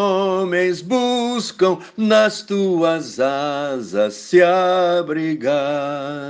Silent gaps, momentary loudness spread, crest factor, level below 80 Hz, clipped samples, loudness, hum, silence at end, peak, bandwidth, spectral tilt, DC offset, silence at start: none; 7 LU; 16 dB; -68 dBFS; under 0.1%; -18 LUFS; none; 0 s; -2 dBFS; 9.6 kHz; -5 dB/octave; under 0.1%; 0 s